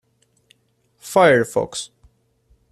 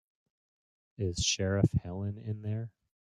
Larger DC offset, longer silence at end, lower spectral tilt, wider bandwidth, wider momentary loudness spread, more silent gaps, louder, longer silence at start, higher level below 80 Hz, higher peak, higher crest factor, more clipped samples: neither; first, 0.85 s vs 0.3 s; about the same, -4.5 dB/octave vs -4.5 dB/octave; first, 14.5 kHz vs 11 kHz; first, 22 LU vs 10 LU; neither; first, -18 LUFS vs -32 LUFS; about the same, 1.05 s vs 1 s; second, -58 dBFS vs -52 dBFS; first, -2 dBFS vs -10 dBFS; about the same, 20 dB vs 24 dB; neither